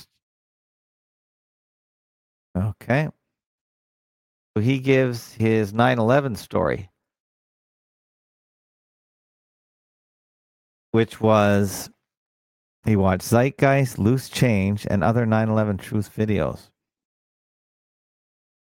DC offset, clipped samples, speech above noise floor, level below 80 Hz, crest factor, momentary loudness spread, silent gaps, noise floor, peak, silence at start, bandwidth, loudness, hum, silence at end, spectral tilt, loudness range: under 0.1%; under 0.1%; over 70 dB; -52 dBFS; 20 dB; 10 LU; 3.46-4.54 s, 7.20-10.93 s, 12.17-12.83 s; under -90 dBFS; -4 dBFS; 2.55 s; 17 kHz; -21 LUFS; none; 2.25 s; -6.5 dB/octave; 10 LU